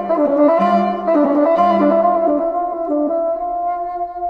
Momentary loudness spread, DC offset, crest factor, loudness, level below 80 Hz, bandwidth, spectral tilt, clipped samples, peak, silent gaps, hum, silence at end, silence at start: 7 LU; under 0.1%; 12 dB; -16 LUFS; -52 dBFS; 5.6 kHz; -9 dB/octave; under 0.1%; -4 dBFS; none; none; 0 s; 0 s